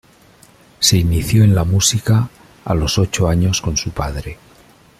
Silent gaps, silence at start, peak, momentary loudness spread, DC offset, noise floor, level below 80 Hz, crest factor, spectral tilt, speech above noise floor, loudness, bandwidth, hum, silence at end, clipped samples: none; 0.8 s; 0 dBFS; 12 LU; under 0.1%; -48 dBFS; -32 dBFS; 16 dB; -4.5 dB/octave; 33 dB; -16 LUFS; 15.5 kHz; none; 0.65 s; under 0.1%